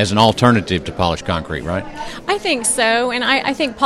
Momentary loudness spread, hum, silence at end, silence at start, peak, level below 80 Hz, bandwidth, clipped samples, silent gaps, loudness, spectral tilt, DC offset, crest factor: 10 LU; none; 0 s; 0 s; 0 dBFS; -40 dBFS; 14 kHz; under 0.1%; none; -17 LUFS; -4 dB/octave; under 0.1%; 16 dB